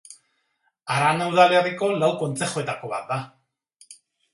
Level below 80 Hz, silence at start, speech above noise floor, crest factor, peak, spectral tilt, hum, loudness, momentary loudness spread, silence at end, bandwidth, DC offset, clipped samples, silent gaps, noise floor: -68 dBFS; 0.1 s; 50 dB; 20 dB; -4 dBFS; -4.5 dB/octave; none; -22 LUFS; 13 LU; 0.4 s; 11.5 kHz; under 0.1%; under 0.1%; none; -71 dBFS